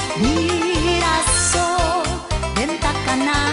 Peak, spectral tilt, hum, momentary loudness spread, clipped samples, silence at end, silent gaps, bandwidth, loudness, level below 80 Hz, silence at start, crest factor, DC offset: -4 dBFS; -3.5 dB/octave; none; 6 LU; under 0.1%; 0 s; none; 11 kHz; -18 LUFS; -30 dBFS; 0 s; 14 dB; under 0.1%